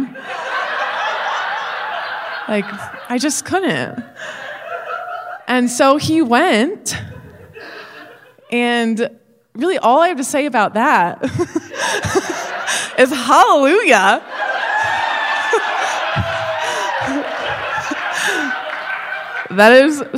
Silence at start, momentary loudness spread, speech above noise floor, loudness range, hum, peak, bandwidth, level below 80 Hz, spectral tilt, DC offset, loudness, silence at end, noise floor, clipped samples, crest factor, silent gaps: 0 s; 16 LU; 27 dB; 7 LU; none; 0 dBFS; 16 kHz; -56 dBFS; -3.5 dB/octave; under 0.1%; -16 LUFS; 0 s; -41 dBFS; under 0.1%; 16 dB; none